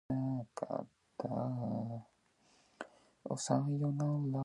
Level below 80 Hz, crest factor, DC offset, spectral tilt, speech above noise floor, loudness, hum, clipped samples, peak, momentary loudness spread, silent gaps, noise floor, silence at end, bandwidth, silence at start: -72 dBFS; 22 dB; under 0.1%; -7 dB/octave; 35 dB; -38 LUFS; none; under 0.1%; -16 dBFS; 18 LU; none; -71 dBFS; 0 s; 11 kHz; 0.1 s